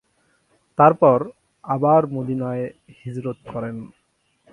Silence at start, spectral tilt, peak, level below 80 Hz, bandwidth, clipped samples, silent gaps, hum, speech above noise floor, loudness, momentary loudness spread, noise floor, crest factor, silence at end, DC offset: 0.8 s; -10 dB/octave; 0 dBFS; -60 dBFS; 10.5 kHz; under 0.1%; none; none; 47 dB; -20 LUFS; 18 LU; -67 dBFS; 22 dB; 0.65 s; under 0.1%